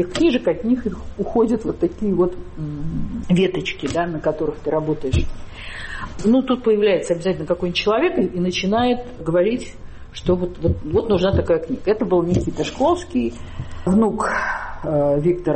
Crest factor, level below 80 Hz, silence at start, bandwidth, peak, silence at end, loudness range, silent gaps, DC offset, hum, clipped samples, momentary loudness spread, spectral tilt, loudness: 14 dB; -34 dBFS; 0 s; 8.8 kHz; -6 dBFS; 0 s; 3 LU; none; under 0.1%; none; under 0.1%; 11 LU; -6.5 dB/octave; -20 LUFS